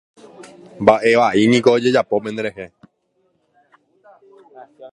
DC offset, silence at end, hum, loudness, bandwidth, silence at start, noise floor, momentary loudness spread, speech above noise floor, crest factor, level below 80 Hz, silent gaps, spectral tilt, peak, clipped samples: under 0.1%; 0.05 s; none; -16 LUFS; 11 kHz; 0.4 s; -65 dBFS; 14 LU; 50 dB; 18 dB; -58 dBFS; none; -5.5 dB/octave; 0 dBFS; under 0.1%